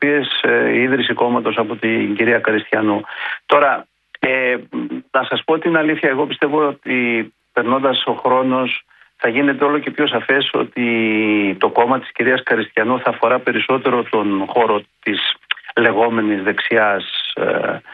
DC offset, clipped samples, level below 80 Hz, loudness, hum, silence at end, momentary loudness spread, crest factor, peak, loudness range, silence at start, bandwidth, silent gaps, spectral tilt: under 0.1%; under 0.1%; -64 dBFS; -17 LUFS; none; 0 s; 6 LU; 16 dB; 0 dBFS; 2 LU; 0 s; 4.9 kHz; none; -8 dB/octave